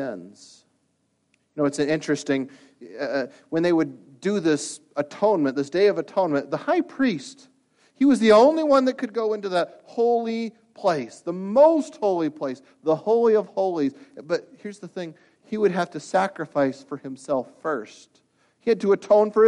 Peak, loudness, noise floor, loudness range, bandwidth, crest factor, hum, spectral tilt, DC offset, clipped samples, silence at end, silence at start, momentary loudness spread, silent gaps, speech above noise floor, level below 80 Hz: -4 dBFS; -23 LUFS; -70 dBFS; 6 LU; 11 kHz; 18 dB; none; -5.5 dB/octave; under 0.1%; under 0.1%; 0 s; 0 s; 16 LU; none; 48 dB; -70 dBFS